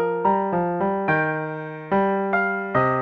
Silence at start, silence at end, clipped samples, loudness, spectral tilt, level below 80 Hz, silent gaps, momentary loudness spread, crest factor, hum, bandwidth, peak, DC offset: 0 s; 0 s; under 0.1%; -22 LUFS; -9.5 dB/octave; -56 dBFS; none; 5 LU; 16 dB; none; 5.4 kHz; -6 dBFS; under 0.1%